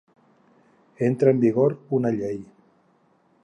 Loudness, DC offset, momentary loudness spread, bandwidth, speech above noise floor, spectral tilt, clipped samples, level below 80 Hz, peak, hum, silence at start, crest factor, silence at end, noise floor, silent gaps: -22 LUFS; under 0.1%; 11 LU; 9.2 kHz; 41 dB; -10 dB/octave; under 0.1%; -68 dBFS; -4 dBFS; none; 1 s; 20 dB; 1 s; -62 dBFS; none